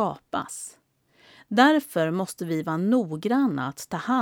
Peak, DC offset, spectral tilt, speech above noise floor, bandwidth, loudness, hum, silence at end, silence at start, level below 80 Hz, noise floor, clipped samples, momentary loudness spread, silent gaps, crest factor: -6 dBFS; under 0.1%; -5 dB/octave; 35 dB; 18 kHz; -25 LUFS; none; 0 s; 0 s; -70 dBFS; -60 dBFS; under 0.1%; 13 LU; none; 20 dB